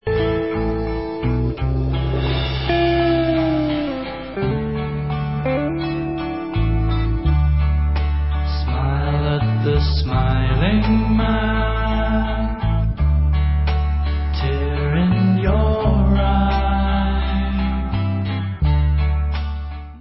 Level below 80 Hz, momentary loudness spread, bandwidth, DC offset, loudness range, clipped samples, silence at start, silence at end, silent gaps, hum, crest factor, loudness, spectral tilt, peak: -22 dBFS; 6 LU; 5.8 kHz; 0.2%; 3 LU; under 0.1%; 0.05 s; 0 s; none; none; 14 dB; -20 LUFS; -12 dB/octave; -4 dBFS